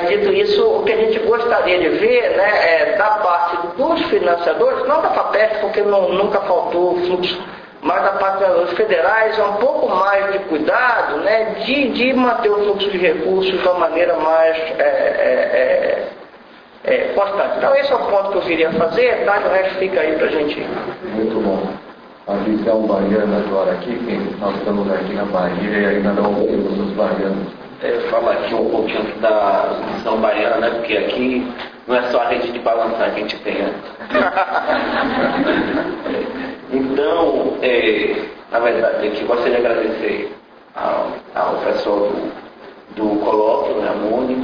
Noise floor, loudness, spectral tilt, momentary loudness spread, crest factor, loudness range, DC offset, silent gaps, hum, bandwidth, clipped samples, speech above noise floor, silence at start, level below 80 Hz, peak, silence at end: -42 dBFS; -17 LUFS; -7 dB/octave; 8 LU; 14 dB; 4 LU; under 0.1%; none; none; 5.4 kHz; under 0.1%; 25 dB; 0 s; -50 dBFS; -2 dBFS; 0 s